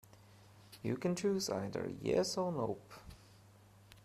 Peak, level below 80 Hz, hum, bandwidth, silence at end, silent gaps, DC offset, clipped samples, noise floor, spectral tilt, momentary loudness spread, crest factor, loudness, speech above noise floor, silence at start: -22 dBFS; -68 dBFS; none; 15 kHz; 0.05 s; none; under 0.1%; under 0.1%; -62 dBFS; -5 dB/octave; 21 LU; 18 dB; -37 LUFS; 25 dB; 0.15 s